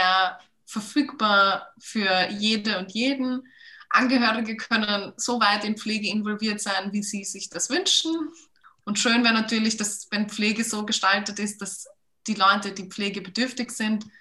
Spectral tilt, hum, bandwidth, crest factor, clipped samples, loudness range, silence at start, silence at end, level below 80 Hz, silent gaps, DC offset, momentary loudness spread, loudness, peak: -2.5 dB/octave; none; 12.5 kHz; 20 dB; under 0.1%; 2 LU; 0 s; 0.1 s; -72 dBFS; none; under 0.1%; 12 LU; -24 LUFS; -6 dBFS